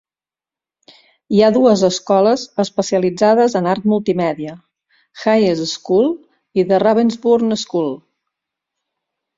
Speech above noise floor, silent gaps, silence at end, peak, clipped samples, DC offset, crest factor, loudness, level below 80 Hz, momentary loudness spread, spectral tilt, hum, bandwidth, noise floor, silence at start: over 75 dB; none; 1.4 s; 0 dBFS; under 0.1%; under 0.1%; 16 dB; -16 LUFS; -60 dBFS; 9 LU; -5.5 dB/octave; none; 7.8 kHz; under -90 dBFS; 1.3 s